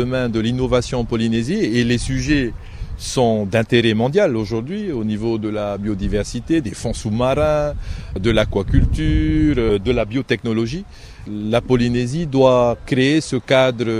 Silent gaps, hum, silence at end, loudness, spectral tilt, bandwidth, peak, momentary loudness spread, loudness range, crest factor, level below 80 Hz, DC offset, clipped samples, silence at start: none; none; 0 s; -18 LUFS; -6 dB/octave; 13.5 kHz; 0 dBFS; 9 LU; 3 LU; 18 dB; -30 dBFS; under 0.1%; under 0.1%; 0 s